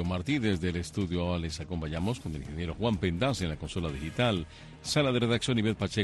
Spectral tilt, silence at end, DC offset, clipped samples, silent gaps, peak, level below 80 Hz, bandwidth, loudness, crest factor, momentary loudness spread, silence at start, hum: -5.5 dB/octave; 0 s; under 0.1%; under 0.1%; none; -14 dBFS; -46 dBFS; 12.5 kHz; -31 LUFS; 16 dB; 9 LU; 0 s; none